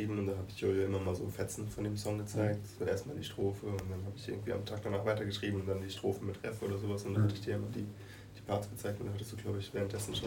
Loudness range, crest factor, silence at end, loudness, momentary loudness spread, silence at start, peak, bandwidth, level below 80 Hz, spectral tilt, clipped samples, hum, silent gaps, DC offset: 2 LU; 18 dB; 0 s; -38 LUFS; 8 LU; 0 s; -20 dBFS; 17 kHz; -60 dBFS; -6 dB/octave; under 0.1%; none; none; under 0.1%